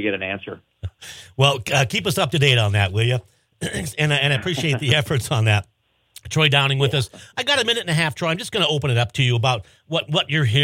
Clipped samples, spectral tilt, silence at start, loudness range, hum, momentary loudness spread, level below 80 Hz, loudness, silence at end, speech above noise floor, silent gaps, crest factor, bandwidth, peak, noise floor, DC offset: under 0.1%; -4.5 dB/octave; 0 s; 1 LU; none; 12 LU; -50 dBFS; -20 LUFS; 0 s; 29 dB; none; 18 dB; 16.5 kHz; -2 dBFS; -49 dBFS; under 0.1%